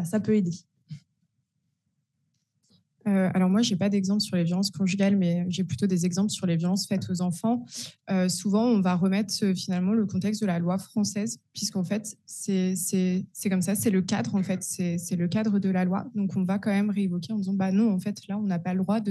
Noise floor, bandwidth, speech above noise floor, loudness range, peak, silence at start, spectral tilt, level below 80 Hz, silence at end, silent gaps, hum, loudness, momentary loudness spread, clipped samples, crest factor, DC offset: -77 dBFS; 12.5 kHz; 51 dB; 3 LU; -12 dBFS; 0 s; -5.5 dB/octave; -74 dBFS; 0 s; none; none; -26 LUFS; 7 LU; under 0.1%; 14 dB; under 0.1%